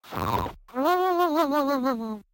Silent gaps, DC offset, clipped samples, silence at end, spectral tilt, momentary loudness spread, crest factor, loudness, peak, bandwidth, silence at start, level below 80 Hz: none; under 0.1%; under 0.1%; 0.1 s; -6 dB/octave; 7 LU; 14 dB; -25 LUFS; -10 dBFS; 17 kHz; 0.05 s; -50 dBFS